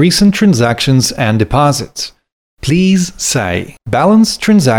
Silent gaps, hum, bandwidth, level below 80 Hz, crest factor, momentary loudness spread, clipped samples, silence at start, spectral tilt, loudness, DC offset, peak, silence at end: 2.32-2.57 s; none; 18 kHz; -34 dBFS; 12 dB; 11 LU; under 0.1%; 0 s; -5 dB/octave; -11 LUFS; 0.1%; 0 dBFS; 0 s